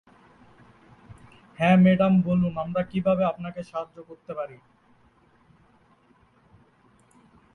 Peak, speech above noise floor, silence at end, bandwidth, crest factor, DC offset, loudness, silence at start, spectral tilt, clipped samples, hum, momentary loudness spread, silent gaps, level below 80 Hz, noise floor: -8 dBFS; 37 dB; 3 s; 4.1 kHz; 20 dB; under 0.1%; -23 LUFS; 1.6 s; -9 dB/octave; under 0.1%; none; 20 LU; none; -58 dBFS; -61 dBFS